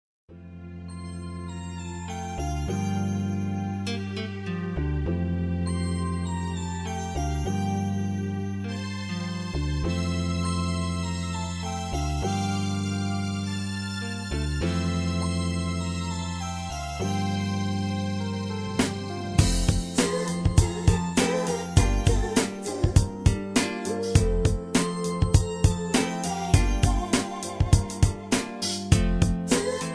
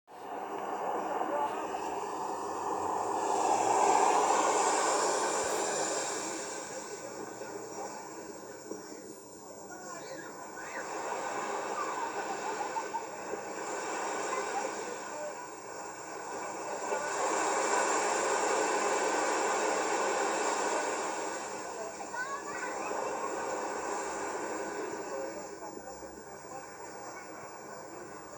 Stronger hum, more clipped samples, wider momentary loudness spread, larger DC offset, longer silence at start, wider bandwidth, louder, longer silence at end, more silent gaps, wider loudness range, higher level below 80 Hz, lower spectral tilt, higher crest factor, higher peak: neither; neither; second, 8 LU vs 15 LU; neither; first, 0.3 s vs 0.1 s; second, 11 kHz vs over 20 kHz; first, -27 LUFS vs -33 LUFS; about the same, 0 s vs 0 s; neither; second, 5 LU vs 13 LU; first, -34 dBFS vs -72 dBFS; first, -5.5 dB/octave vs -1.5 dB/octave; about the same, 22 dB vs 20 dB; first, -4 dBFS vs -14 dBFS